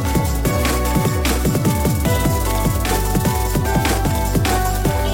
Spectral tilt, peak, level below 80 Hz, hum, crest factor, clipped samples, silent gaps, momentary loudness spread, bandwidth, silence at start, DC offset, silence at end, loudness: -5 dB/octave; -6 dBFS; -22 dBFS; none; 10 dB; under 0.1%; none; 1 LU; 17 kHz; 0 s; 0.2%; 0 s; -18 LUFS